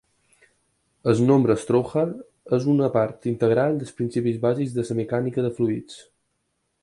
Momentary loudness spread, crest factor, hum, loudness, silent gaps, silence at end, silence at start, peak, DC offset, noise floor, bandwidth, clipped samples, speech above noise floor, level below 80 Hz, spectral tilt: 8 LU; 18 dB; none; -23 LUFS; none; 0.8 s; 1.05 s; -6 dBFS; under 0.1%; -74 dBFS; 11.5 kHz; under 0.1%; 52 dB; -60 dBFS; -8 dB/octave